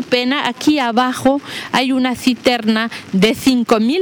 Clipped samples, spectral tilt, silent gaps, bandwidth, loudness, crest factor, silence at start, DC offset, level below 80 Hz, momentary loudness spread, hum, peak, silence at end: under 0.1%; -4.5 dB/octave; none; over 20 kHz; -16 LUFS; 16 dB; 0 s; under 0.1%; -52 dBFS; 4 LU; none; 0 dBFS; 0 s